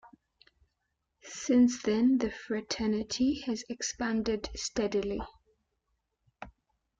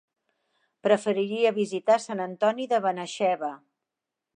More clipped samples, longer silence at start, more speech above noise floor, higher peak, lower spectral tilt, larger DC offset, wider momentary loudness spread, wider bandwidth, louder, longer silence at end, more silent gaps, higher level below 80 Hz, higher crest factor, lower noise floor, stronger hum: neither; second, 0.05 s vs 0.85 s; second, 52 dB vs 62 dB; second, -16 dBFS vs -8 dBFS; about the same, -4 dB/octave vs -5 dB/octave; neither; first, 20 LU vs 8 LU; second, 7.8 kHz vs 10 kHz; second, -30 LUFS vs -26 LUFS; second, 0.5 s vs 0.8 s; neither; first, -56 dBFS vs -84 dBFS; about the same, 16 dB vs 20 dB; second, -82 dBFS vs -87 dBFS; neither